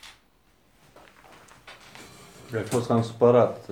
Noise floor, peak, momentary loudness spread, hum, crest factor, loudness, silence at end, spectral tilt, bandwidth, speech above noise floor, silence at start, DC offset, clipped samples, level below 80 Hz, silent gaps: -63 dBFS; -6 dBFS; 28 LU; none; 22 dB; -23 LUFS; 0.1 s; -6.5 dB/octave; 15.5 kHz; 41 dB; 0.05 s; under 0.1%; under 0.1%; -64 dBFS; none